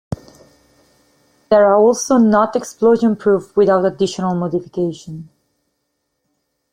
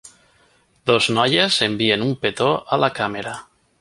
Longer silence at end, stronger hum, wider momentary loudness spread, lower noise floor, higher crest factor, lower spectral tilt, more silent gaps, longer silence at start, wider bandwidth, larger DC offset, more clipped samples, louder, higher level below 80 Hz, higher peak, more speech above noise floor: first, 1.5 s vs 0.4 s; neither; first, 18 LU vs 11 LU; first, -72 dBFS vs -58 dBFS; about the same, 16 dB vs 20 dB; first, -6 dB/octave vs -4 dB/octave; neither; about the same, 0.1 s vs 0.05 s; first, 15 kHz vs 11.5 kHz; neither; neither; first, -15 LUFS vs -19 LUFS; about the same, -54 dBFS vs -56 dBFS; about the same, -2 dBFS vs 0 dBFS; first, 57 dB vs 39 dB